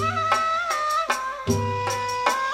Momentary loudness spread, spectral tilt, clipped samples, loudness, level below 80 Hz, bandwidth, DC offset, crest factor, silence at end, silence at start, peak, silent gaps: 4 LU; -4 dB/octave; under 0.1%; -24 LUFS; -50 dBFS; 16 kHz; under 0.1%; 18 dB; 0 s; 0 s; -6 dBFS; none